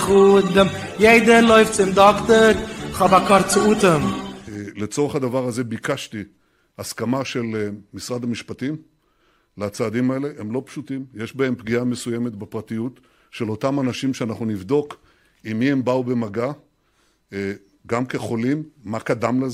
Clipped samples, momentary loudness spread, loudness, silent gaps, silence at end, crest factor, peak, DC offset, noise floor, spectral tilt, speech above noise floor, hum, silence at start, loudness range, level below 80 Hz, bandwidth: under 0.1%; 18 LU; -19 LUFS; none; 0 s; 20 dB; 0 dBFS; under 0.1%; -63 dBFS; -5 dB/octave; 44 dB; none; 0 s; 12 LU; -48 dBFS; 15.5 kHz